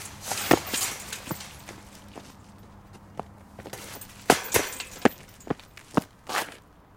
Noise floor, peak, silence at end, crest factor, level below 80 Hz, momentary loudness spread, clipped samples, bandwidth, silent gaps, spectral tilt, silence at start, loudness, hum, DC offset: -49 dBFS; 0 dBFS; 0.35 s; 30 dB; -56 dBFS; 23 LU; under 0.1%; 17 kHz; none; -3 dB/octave; 0 s; -28 LUFS; none; under 0.1%